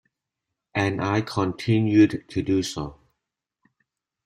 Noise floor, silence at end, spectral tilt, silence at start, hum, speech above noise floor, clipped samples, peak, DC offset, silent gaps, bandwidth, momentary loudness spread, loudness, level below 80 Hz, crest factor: -84 dBFS; 1.35 s; -6.5 dB/octave; 0.75 s; none; 62 dB; under 0.1%; -6 dBFS; under 0.1%; none; 12 kHz; 12 LU; -23 LUFS; -54 dBFS; 18 dB